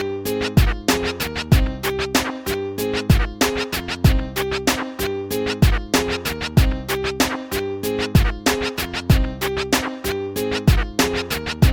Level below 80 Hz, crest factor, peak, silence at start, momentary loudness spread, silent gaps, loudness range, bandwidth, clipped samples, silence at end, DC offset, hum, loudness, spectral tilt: -26 dBFS; 16 dB; -4 dBFS; 0 s; 6 LU; none; 1 LU; 17.5 kHz; under 0.1%; 0 s; under 0.1%; none; -21 LUFS; -5 dB/octave